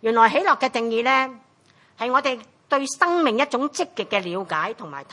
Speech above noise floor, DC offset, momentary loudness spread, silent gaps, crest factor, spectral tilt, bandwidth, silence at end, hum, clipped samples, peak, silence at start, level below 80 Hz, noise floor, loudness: 36 dB; under 0.1%; 11 LU; none; 20 dB; -3 dB/octave; 11.5 kHz; 0.1 s; none; under 0.1%; -2 dBFS; 0.05 s; -78 dBFS; -57 dBFS; -22 LUFS